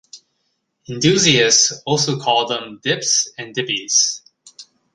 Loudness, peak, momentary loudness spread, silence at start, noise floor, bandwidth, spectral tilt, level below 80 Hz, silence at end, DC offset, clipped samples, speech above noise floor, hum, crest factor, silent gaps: -16 LUFS; 0 dBFS; 11 LU; 0.15 s; -70 dBFS; 11 kHz; -2 dB/octave; -56 dBFS; 0.3 s; under 0.1%; under 0.1%; 53 dB; none; 20 dB; none